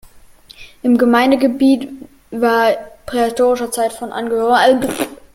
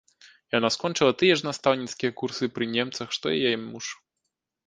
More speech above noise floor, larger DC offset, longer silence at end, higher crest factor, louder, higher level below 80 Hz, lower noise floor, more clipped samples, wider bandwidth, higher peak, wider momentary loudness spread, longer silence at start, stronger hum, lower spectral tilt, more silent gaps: second, 28 dB vs 56 dB; neither; second, 0.2 s vs 0.75 s; second, 14 dB vs 22 dB; first, -15 LUFS vs -25 LUFS; first, -50 dBFS vs -64 dBFS; second, -43 dBFS vs -82 dBFS; neither; first, 16.5 kHz vs 9.8 kHz; first, 0 dBFS vs -6 dBFS; about the same, 12 LU vs 10 LU; about the same, 0.6 s vs 0.55 s; neither; about the same, -4 dB/octave vs -4 dB/octave; neither